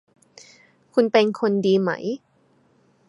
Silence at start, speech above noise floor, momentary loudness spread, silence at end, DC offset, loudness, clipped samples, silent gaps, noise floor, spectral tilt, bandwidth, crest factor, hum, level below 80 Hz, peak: 0.95 s; 41 dB; 11 LU; 0.9 s; under 0.1%; -21 LUFS; under 0.1%; none; -61 dBFS; -6.5 dB/octave; 11 kHz; 20 dB; none; -74 dBFS; -4 dBFS